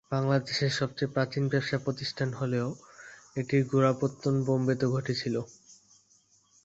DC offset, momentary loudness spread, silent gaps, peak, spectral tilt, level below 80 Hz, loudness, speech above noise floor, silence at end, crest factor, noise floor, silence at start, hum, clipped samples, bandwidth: under 0.1%; 10 LU; none; -10 dBFS; -6.5 dB/octave; -64 dBFS; -29 LUFS; 37 dB; 0.9 s; 20 dB; -65 dBFS; 0.1 s; none; under 0.1%; 8 kHz